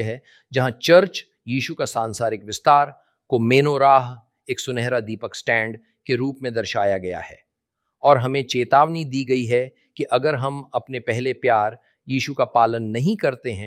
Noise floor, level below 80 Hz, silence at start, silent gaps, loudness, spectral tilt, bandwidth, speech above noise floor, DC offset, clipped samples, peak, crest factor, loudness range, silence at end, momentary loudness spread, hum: -79 dBFS; -62 dBFS; 0 s; none; -21 LUFS; -5.5 dB/octave; 15.5 kHz; 59 dB; under 0.1%; under 0.1%; -2 dBFS; 20 dB; 4 LU; 0 s; 13 LU; none